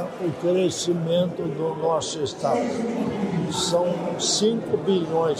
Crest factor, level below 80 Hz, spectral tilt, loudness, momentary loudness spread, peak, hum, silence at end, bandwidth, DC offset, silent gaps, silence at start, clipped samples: 14 dB; -60 dBFS; -4.5 dB/octave; -24 LUFS; 5 LU; -10 dBFS; none; 0 s; 15 kHz; under 0.1%; none; 0 s; under 0.1%